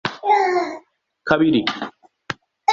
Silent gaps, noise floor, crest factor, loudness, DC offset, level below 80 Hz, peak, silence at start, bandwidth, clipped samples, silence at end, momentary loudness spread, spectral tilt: none; -48 dBFS; 20 dB; -19 LUFS; under 0.1%; -56 dBFS; 0 dBFS; 0.05 s; 7.6 kHz; under 0.1%; 0 s; 16 LU; -5 dB/octave